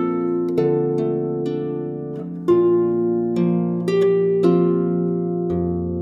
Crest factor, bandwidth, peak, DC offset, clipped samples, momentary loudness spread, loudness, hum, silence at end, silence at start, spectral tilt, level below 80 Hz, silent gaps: 16 dB; 7 kHz; -4 dBFS; under 0.1%; under 0.1%; 9 LU; -20 LUFS; none; 0 s; 0 s; -10 dB/octave; -50 dBFS; none